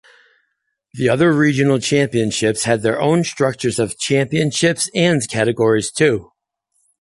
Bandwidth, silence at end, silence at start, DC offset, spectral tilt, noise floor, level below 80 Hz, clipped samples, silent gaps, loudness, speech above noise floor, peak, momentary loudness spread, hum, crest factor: 11.5 kHz; 0.8 s; 0.95 s; under 0.1%; -5 dB/octave; -72 dBFS; -52 dBFS; under 0.1%; none; -17 LUFS; 55 dB; -2 dBFS; 5 LU; none; 16 dB